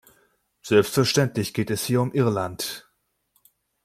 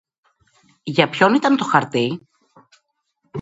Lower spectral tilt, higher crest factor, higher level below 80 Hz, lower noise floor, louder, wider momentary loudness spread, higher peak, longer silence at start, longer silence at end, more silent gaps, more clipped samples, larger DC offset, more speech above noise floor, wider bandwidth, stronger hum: about the same, -5 dB/octave vs -5.5 dB/octave; about the same, 22 dB vs 20 dB; first, -60 dBFS vs -66 dBFS; about the same, -71 dBFS vs -70 dBFS; second, -23 LUFS vs -18 LUFS; second, 11 LU vs 18 LU; second, -4 dBFS vs 0 dBFS; second, 0.65 s vs 0.85 s; first, 1.05 s vs 0 s; neither; neither; neither; about the same, 49 dB vs 52 dB; first, 16 kHz vs 8 kHz; neither